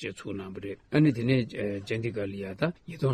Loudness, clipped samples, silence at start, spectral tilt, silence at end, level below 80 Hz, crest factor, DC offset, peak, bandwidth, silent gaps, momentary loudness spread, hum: -30 LUFS; under 0.1%; 0 s; -7.5 dB/octave; 0 s; -60 dBFS; 16 dB; under 0.1%; -12 dBFS; 10 kHz; none; 13 LU; none